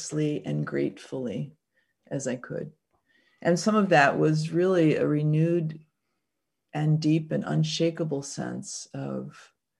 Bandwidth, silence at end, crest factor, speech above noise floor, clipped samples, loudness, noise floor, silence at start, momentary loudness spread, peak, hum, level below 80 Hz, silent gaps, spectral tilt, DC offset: 11 kHz; 0.4 s; 22 dB; 57 dB; under 0.1%; -26 LUFS; -83 dBFS; 0 s; 15 LU; -6 dBFS; none; -70 dBFS; none; -6 dB/octave; under 0.1%